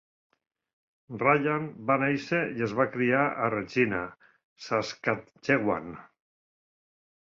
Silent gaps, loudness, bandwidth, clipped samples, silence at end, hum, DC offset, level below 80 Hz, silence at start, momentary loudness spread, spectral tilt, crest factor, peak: 4.44-4.56 s; -27 LUFS; 7.6 kHz; under 0.1%; 1.25 s; none; under 0.1%; -64 dBFS; 1.1 s; 10 LU; -6.5 dB/octave; 22 dB; -8 dBFS